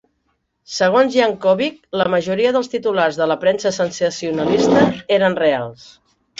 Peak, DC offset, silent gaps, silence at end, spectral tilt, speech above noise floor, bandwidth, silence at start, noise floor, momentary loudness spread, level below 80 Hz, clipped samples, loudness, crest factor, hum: -2 dBFS; under 0.1%; none; 0.65 s; -5 dB/octave; 52 dB; 8 kHz; 0.7 s; -68 dBFS; 7 LU; -54 dBFS; under 0.1%; -17 LUFS; 16 dB; none